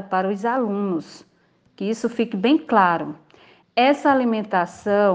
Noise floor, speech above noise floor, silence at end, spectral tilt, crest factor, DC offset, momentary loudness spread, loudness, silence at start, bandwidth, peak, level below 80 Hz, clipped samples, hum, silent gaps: -61 dBFS; 41 dB; 0 s; -6 dB/octave; 18 dB; under 0.1%; 9 LU; -21 LUFS; 0 s; 9.4 kHz; -2 dBFS; -68 dBFS; under 0.1%; none; none